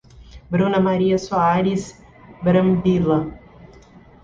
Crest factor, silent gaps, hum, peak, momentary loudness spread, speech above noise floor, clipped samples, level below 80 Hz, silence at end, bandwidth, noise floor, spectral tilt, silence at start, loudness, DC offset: 14 dB; none; none; -6 dBFS; 8 LU; 28 dB; under 0.1%; -46 dBFS; 0.85 s; 7.6 kHz; -46 dBFS; -7.5 dB/octave; 0.2 s; -19 LUFS; under 0.1%